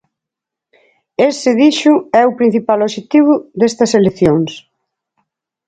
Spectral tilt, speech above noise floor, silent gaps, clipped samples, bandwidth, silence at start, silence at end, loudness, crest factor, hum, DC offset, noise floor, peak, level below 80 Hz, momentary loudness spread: -5.5 dB/octave; 71 dB; none; under 0.1%; 9.2 kHz; 1.2 s; 1.1 s; -12 LUFS; 14 dB; none; under 0.1%; -83 dBFS; 0 dBFS; -50 dBFS; 5 LU